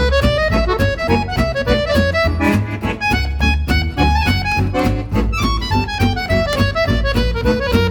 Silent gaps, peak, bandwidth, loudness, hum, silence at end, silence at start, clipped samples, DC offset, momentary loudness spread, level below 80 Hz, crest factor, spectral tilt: none; -2 dBFS; 19 kHz; -17 LUFS; none; 0 s; 0 s; under 0.1%; under 0.1%; 3 LU; -22 dBFS; 14 dB; -6 dB/octave